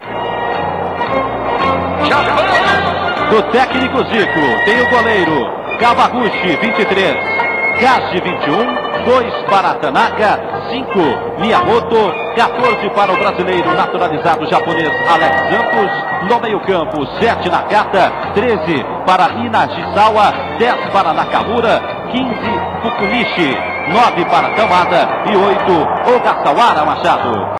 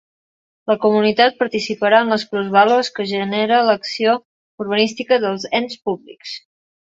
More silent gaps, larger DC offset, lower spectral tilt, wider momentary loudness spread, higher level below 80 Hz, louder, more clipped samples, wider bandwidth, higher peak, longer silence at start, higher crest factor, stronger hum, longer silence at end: second, none vs 4.25-4.58 s; neither; about the same, -5.5 dB/octave vs -4.5 dB/octave; second, 6 LU vs 14 LU; first, -46 dBFS vs -64 dBFS; first, -13 LUFS vs -17 LUFS; neither; first, 12.5 kHz vs 7.8 kHz; about the same, 0 dBFS vs 0 dBFS; second, 0 s vs 0.65 s; second, 12 dB vs 18 dB; neither; second, 0 s vs 0.45 s